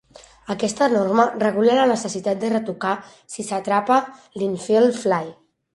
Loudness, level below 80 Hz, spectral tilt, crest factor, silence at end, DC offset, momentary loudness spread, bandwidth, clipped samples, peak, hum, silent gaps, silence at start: -20 LUFS; -64 dBFS; -5 dB/octave; 18 dB; 0.45 s; under 0.1%; 12 LU; 11.5 kHz; under 0.1%; -2 dBFS; none; none; 0.5 s